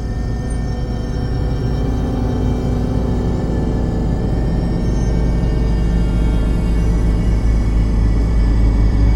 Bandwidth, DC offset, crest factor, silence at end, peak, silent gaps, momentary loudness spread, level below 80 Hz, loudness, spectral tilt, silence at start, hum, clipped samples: 9.4 kHz; under 0.1%; 12 dB; 0 s; -4 dBFS; none; 6 LU; -18 dBFS; -18 LUFS; -8 dB/octave; 0 s; none; under 0.1%